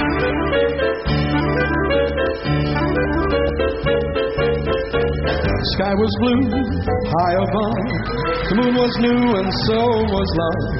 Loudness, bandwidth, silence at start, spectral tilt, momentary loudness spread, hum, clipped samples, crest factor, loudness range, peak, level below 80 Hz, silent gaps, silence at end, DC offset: -19 LUFS; 6 kHz; 0 s; -5 dB/octave; 4 LU; none; under 0.1%; 12 dB; 1 LU; -6 dBFS; -30 dBFS; none; 0 s; under 0.1%